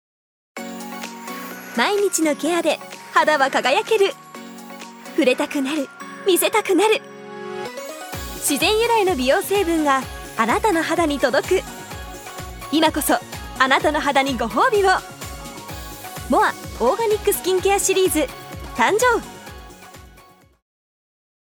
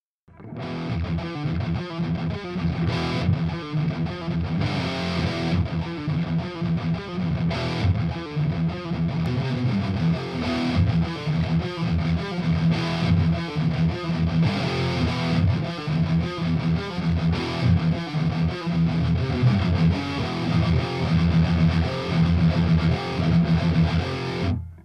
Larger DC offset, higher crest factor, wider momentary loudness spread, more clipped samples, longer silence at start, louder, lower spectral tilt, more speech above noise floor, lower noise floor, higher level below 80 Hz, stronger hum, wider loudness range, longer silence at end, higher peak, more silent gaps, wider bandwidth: neither; first, 20 dB vs 14 dB; first, 17 LU vs 7 LU; neither; first, 0.55 s vs 0.4 s; first, -19 LUFS vs -24 LUFS; second, -3 dB/octave vs -7.5 dB/octave; first, 31 dB vs 20 dB; first, -49 dBFS vs -45 dBFS; second, -44 dBFS vs -38 dBFS; neither; about the same, 2 LU vs 4 LU; first, 1.3 s vs 0.05 s; first, 0 dBFS vs -8 dBFS; neither; first, over 20 kHz vs 8.4 kHz